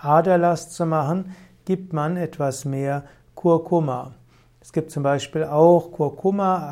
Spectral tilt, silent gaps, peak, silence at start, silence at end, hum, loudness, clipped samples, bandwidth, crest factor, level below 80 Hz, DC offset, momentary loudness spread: -7 dB/octave; none; -4 dBFS; 0.05 s; 0 s; none; -22 LUFS; under 0.1%; 15 kHz; 18 dB; -60 dBFS; under 0.1%; 12 LU